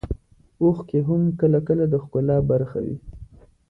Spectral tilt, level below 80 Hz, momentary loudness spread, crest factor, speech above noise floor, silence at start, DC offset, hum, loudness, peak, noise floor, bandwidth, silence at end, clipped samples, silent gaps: -12.5 dB/octave; -42 dBFS; 13 LU; 14 dB; 25 dB; 0.05 s; under 0.1%; none; -22 LUFS; -8 dBFS; -45 dBFS; 3 kHz; 0.45 s; under 0.1%; none